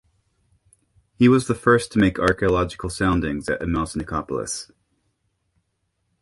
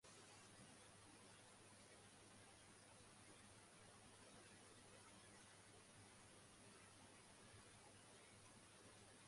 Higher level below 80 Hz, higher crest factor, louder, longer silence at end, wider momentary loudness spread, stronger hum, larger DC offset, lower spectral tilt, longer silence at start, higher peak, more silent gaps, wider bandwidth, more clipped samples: first, -40 dBFS vs -84 dBFS; first, 22 dB vs 14 dB; first, -21 LUFS vs -65 LUFS; first, 1.55 s vs 0 s; first, 10 LU vs 1 LU; neither; neither; first, -5.5 dB/octave vs -3 dB/octave; first, 1.2 s vs 0 s; first, -2 dBFS vs -52 dBFS; neither; about the same, 11.5 kHz vs 11.5 kHz; neither